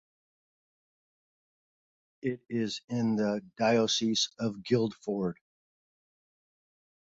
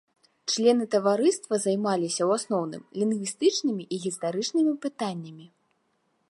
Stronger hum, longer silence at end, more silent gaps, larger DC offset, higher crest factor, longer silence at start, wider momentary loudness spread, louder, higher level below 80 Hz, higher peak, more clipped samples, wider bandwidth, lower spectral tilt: neither; first, 1.75 s vs 0.85 s; first, 2.84-2.88 s vs none; neither; about the same, 20 dB vs 18 dB; first, 2.25 s vs 0.45 s; about the same, 10 LU vs 10 LU; second, -30 LUFS vs -26 LUFS; first, -70 dBFS vs -80 dBFS; second, -14 dBFS vs -10 dBFS; neither; second, 7.8 kHz vs 11.5 kHz; about the same, -4.5 dB/octave vs -4.5 dB/octave